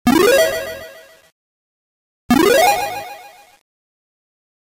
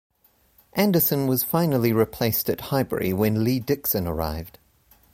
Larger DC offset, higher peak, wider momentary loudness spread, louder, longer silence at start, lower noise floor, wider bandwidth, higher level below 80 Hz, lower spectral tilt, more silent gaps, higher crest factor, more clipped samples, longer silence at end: neither; first, -2 dBFS vs -8 dBFS; first, 22 LU vs 9 LU; first, -14 LUFS vs -23 LUFS; second, 0.05 s vs 0.75 s; second, -40 dBFS vs -60 dBFS; about the same, 16 kHz vs 17 kHz; about the same, -50 dBFS vs -46 dBFS; second, -3.5 dB/octave vs -6 dB/octave; first, 1.32-2.29 s vs none; about the same, 18 dB vs 16 dB; neither; first, 1.35 s vs 0.65 s